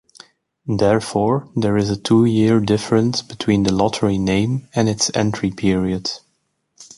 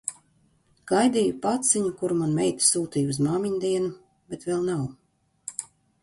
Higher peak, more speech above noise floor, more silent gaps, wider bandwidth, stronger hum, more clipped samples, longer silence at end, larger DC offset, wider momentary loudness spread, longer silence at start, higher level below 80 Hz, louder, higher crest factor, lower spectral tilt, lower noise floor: first, -2 dBFS vs -6 dBFS; first, 51 dB vs 40 dB; neither; about the same, 11.5 kHz vs 11.5 kHz; neither; neither; second, 0.15 s vs 0.35 s; neither; second, 7 LU vs 15 LU; first, 0.65 s vs 0.05 s; first, -44 dBFS vs -62 dBFS; first, -18 LUFS vs -25 LUFS; about the same, 16 dB vs 20 dB; about the same, -5.5 dB/octave vs -4.5 dB/octave; first, -69 dBFS vs -64 dBFS